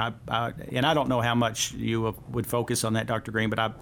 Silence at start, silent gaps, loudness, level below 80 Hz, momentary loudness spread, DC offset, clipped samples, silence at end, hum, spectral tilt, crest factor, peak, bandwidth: 0 s; none; -27 LUFS; -52 dBFS; 5 LU; under 0.1%; under 0.1%; 0 s; none; -4.5 dB/octave; 18 dB; -10 dBFS; 19 kHz